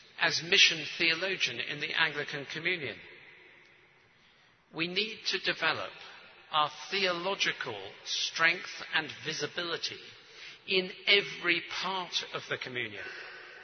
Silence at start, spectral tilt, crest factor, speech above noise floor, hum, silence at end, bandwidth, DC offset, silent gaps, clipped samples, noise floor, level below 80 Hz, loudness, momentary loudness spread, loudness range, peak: 0.15 s; -2 dB/octave; 24 dB; 31 dB; none; 0 s; 6.6 kHz; under 0.1%; none; under 0.1%; -63 dBFS; -80 dBFS; -30 LUFS; 17 LU; 6 LU; -8 dBFS